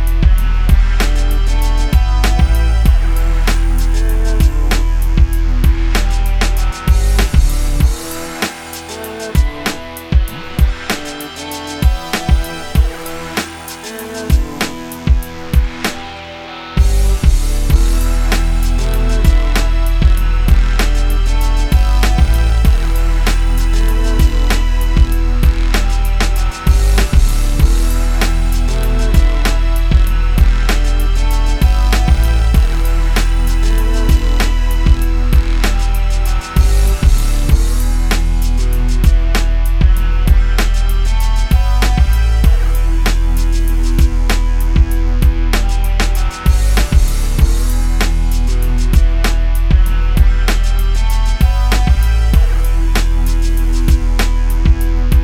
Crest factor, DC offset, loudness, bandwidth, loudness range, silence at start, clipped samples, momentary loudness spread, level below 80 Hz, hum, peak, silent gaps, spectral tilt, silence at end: 10 dB; under 0.1%; -15 LUFS; 15.5 kHz; 4 LU; 0 s; under 0.1%; 4 LU; -12 dBFS; none; 0 dBFS; none; -5 dB/octave; 0 s